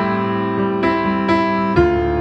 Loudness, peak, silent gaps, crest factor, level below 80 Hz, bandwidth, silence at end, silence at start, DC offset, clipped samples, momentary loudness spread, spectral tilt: -17 LUFS; -2 dBFS; none; 16 dB; -34 dBFS; 8 kHz; 0 s; 0 s; under 0.1%; under 0.1%; 4 LU; -8 dB/octave